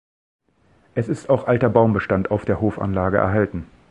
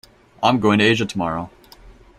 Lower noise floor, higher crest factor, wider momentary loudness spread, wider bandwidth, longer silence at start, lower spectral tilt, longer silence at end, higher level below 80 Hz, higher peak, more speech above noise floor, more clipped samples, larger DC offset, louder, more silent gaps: first, -59 dBFS vs -45 dBFS; about the same, 20 dB vs 20 dB; second, 8 LU vs 13 LU; second, 9.8 kHz vs 13.5 kHz; first, 0.95 s vs 0.4 s; first, -9 dB/octave vs -5.5 dB/octave; about the same, 0.25 s vs 0.25 s; first, -42 dBFS vs -50 dBFS; about the same, 0 dBFS vs -2 dBFS; first, 39 dB vs 28 dB; neither; neither; about the same, -20 LUFS vs -18 LUFS; neither